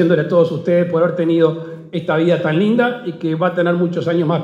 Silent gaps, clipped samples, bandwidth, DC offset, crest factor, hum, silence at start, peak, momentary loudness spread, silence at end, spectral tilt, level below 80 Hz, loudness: none; under 0.1%; 7.4 kHz; under 0.1%; 14 dB; none; 0 s; -2 dBFS; 7 LU; 0 s; -8.5 dB/octave; -66 dBFS; -16 LUFS